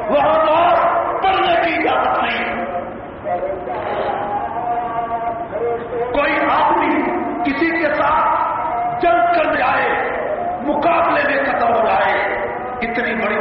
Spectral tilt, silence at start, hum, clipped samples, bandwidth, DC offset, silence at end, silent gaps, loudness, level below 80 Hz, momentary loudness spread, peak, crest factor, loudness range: -2.5 dB/octave; 0 s; none; under 0.1%; 5.6 kHz; under 0.1%; 0 s; none; -17 LUFS; -46 dBFS; 8 LU; -6 dBFS; 12 dB; 5 LU